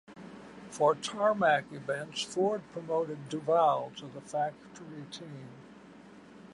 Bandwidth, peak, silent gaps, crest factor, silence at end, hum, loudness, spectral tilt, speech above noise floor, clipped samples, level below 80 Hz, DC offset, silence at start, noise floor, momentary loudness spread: 11.5 kHz; -14 dBFS; none; 20 dB; 0 s; none; -31 LUFS; -4.5 dB/octave; 21 dB; under 0.1%; -74 dBFS; under 0.1%; 0.1 s; -53 dBFS; 22 LU